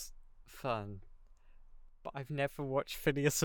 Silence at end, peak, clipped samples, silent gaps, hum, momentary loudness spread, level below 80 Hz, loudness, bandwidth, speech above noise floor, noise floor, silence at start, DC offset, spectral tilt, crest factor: 0 s; -16 dBFS; under 0.1%; none; none; 18 LU; -56 dBFS; -37 LUFS; 19 kHz; 21 dB; -57 dBFS; 0 s; under 0.1%; -4.5 dB/octave; 22 dB